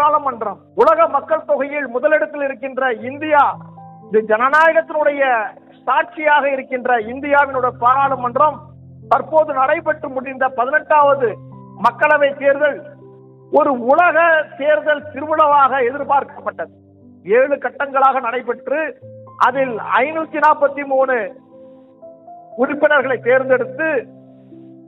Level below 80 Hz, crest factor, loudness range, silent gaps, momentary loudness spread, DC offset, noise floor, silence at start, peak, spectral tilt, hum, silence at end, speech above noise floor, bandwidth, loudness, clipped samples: -64 dBFS; 16 dB; 3 LU; none; 10 LU; under 0.1%; -42 dBFS; 0 s; -2 dBFS; -6.5 dB/octave; none; 0.25 s; 26 dB; 6.6 kHz; -16 LUFS; under 0.1%